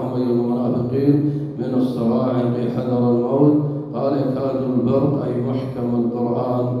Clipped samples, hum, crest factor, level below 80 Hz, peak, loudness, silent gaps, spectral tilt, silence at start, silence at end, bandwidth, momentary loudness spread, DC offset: under 0.1%; none; 16 dB; -54 dBFS; -4 dBFS; -20 LUFS; none; -10.5 dB/octave; 0 s; 0 s; 5.6 kHz; 6 LU; under 0.1%